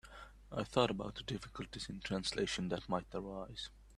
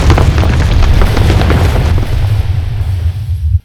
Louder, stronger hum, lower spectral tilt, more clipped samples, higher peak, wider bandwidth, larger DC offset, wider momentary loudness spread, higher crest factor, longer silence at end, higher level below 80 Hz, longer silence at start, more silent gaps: second, -40 LUFS vs -12 LUFS; neither; second, -4.5 dB/octave vs -6.5 dB/octave; second, under 0.1% vs 1%; second, -16 dBFS vs 0 dBFS; about the same, 12.5 kHz vs 13.5 kHz; neither; first, 12 LU vs 6 LU; first, 26 dB vs 8 dB; about the same, 0 s vs 0.05 s; second, -58 dBFS vs -12 dBFS; about the same, 0.05 s vs 0 s; neither